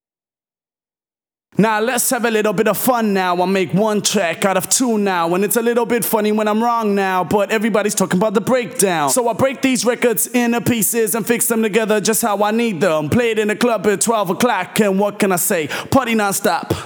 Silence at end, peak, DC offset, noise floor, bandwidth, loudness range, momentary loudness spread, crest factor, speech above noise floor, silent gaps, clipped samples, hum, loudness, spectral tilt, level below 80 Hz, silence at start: 0 s; 0 dBFS; under 0.1%; under -90 dBFS; over 20 kHz; 1 LU; 2 LU; 16 dB; over 74 dB; none; under 0.1%; none; -16 LUFS; -4 dB/octave; -56 dBFS; 1.55 s